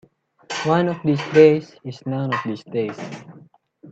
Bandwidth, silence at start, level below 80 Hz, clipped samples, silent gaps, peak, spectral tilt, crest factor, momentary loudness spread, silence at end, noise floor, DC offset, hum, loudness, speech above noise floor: 7.8 kHz; 0.5 s; -64 dBFS; under 0.1%; none; -2 dBFS; -6.5 dB/octave; 20 dB; 20 LU; 0 s; -49 dBFS; under 0.1%; none; -20 LUFS; 30 dB